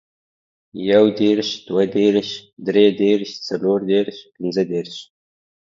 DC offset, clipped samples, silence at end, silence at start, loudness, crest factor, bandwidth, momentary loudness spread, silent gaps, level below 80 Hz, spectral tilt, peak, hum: under 0.1%; under 0.1%; 0.75 s; 0.75 s; -19 LUFS; 18 dB; 7.4 kHz; 13 LU; 2.53-2.57 s; -64 dBFS; -6 dB/octave; 0 dBFS; none